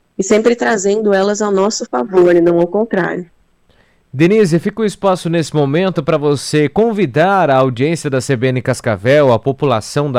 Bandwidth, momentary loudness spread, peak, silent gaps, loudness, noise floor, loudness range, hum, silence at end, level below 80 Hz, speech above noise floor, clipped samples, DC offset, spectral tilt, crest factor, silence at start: 14.5 kHz; 6 LU; -2 dBFS; none; -14 LUFS; -53 dBFS; 2 LU; none; 0 s; -50 dBFS; 40 dB; under 0.1%; under 0.1%; -6 dB/octave; 10 dB; 0.2 s